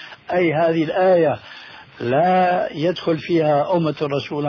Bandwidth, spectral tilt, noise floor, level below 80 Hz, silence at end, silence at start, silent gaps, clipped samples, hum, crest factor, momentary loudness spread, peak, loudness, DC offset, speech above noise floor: 5.4 kHz; -8 dB/octave; -40 dBFS; -60 dBFS; 0 s; 0 s; none; under 0.1%; none; 12 dB; 13 LU; -6 dBFS; -19 LUFS; under 0.1%; 22 dB